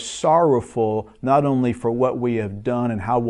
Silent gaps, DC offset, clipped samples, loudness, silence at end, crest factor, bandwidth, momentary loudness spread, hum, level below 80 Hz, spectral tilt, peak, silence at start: none; under 0.1%; under 0.1%; -20 LUFS; 0 s; 16 dB; 11 kHz; 7 LU; none; -50 dBFS; -6.5 dB/octave; -4 dBFS; 0 s